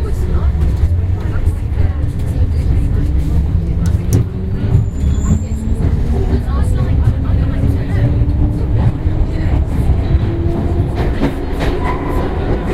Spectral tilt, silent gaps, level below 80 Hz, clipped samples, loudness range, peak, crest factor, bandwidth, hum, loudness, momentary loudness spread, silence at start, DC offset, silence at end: -8 dB/octave; none; -16 dBFS; under 0.1%; 1 LU; 0 dBFS; 12 dB; 12.5 kHz; none; -16 LUFS; 3 LU; 0 s; under 0.1%; 0 s